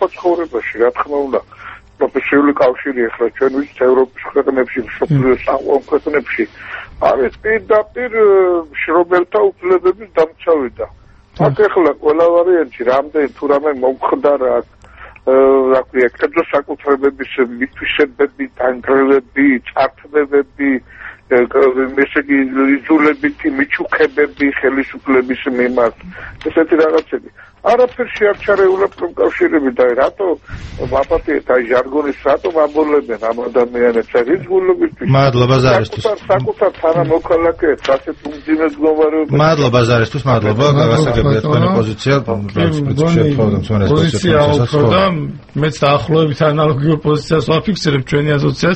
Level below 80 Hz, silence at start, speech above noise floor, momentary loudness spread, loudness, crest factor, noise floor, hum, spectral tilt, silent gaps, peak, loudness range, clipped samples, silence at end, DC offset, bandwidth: -40 dBFS; 0 s; 24 dB; 7 LU; -14 LUFS; 14 dB; -38 dBFS; none; -7 dB/octave; none; 0 dBFS; 2 LU; under 0.1%; 0 s; under 0.1%; 8.4 kHz